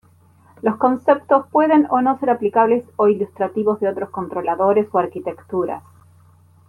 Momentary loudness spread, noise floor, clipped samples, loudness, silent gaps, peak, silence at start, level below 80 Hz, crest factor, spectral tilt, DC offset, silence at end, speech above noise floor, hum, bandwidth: 10 LU; -52 dBFS; under 0.1%; -18 LUFS; none; -2 dBFS; 0.65 s; -66 dBFS; 16 dB; -8.5 dB/octave; under 0.1%; 0.9 s; 34 dB; none; 10.5 kHz